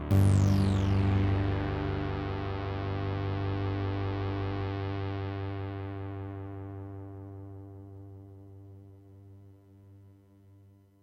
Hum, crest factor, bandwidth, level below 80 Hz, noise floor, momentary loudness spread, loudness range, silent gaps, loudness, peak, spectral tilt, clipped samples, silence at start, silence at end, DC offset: none; 18 dB; 10.5 kHz; -44 dBFS; -58 dBFS; 22 LU; 20 LU; none; -31 LUFS; -14 dBFS; -8 dB/octave; under 0.1%; 0 s; 0.9 s; under 0.1%